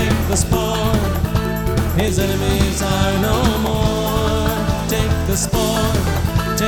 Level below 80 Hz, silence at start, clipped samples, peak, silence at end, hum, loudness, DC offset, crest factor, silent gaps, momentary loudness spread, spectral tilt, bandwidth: -24 dBFS; 0 s; under 0.1%; -2 dBFS; 0 s; none; -18 LUFS; under 0.1%; 14 dB; none; 2 LU; -5 dB/octave; 19 kHz